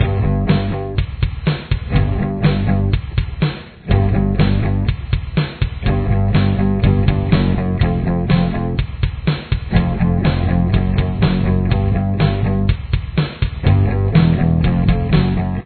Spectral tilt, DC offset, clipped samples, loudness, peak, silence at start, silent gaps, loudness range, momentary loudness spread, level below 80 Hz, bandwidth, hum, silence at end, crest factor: -11 dB/octave; under 0.1%; under 0.1%; -17 LUFS; 0 dBFS; 0 s; none; 2 LU; 6 LU; -24 dBFS; 4.5 kHz; none; 0 s; 16 dB